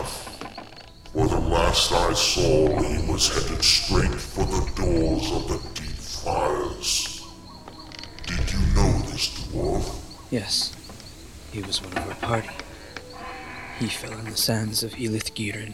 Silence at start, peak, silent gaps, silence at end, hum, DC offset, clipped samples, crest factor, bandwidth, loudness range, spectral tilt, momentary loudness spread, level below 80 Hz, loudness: 0 s; -4 dBFS; none; 0 s; none; 0.3%; under 0.1%; 20 dB; 17 kHz; 8 LU; -3.5 dB/octave; 19 LU; -32 dBFS; -24 LUFS